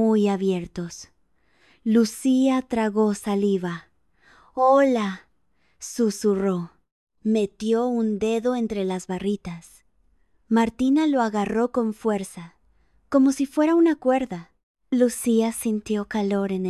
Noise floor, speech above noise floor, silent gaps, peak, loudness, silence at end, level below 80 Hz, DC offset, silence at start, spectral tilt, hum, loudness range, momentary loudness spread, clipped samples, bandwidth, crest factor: -69 dBFS; 47 dB; 6.92-7.07 s, 14.63-14.75 s; -6 dBFS; -23 LUFS; 0 s; -58 dBFS; under 0.1%; 0 s; -6 dB/octave; none; 3 LU; 14 LU; under 0.1%; 13 kHz; 16 dB